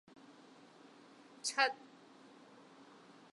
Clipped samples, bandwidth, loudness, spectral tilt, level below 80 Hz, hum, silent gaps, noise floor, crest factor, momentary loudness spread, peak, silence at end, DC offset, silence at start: under 0.1%; 11.5 kHz; -36 LUFS; 0 dB/octave; under -90 dBFS; none; none; -61 dBFS; 28 dB; 26 LU; -16 dBFS; 1.6 s; under 0.1%; 0.3 s